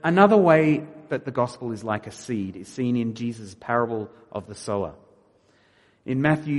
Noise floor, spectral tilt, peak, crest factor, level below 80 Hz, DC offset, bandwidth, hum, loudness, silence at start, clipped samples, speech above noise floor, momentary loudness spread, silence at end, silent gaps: -60 dBFS; -7 dB/octave; -2 dBFS; 22 dB; -62 dBFS; under 0.1%; 11.5 kHz; none; -24 LUFS; 0.05 s; under 0.1%; 37 dB; 18 LU; 0 s; none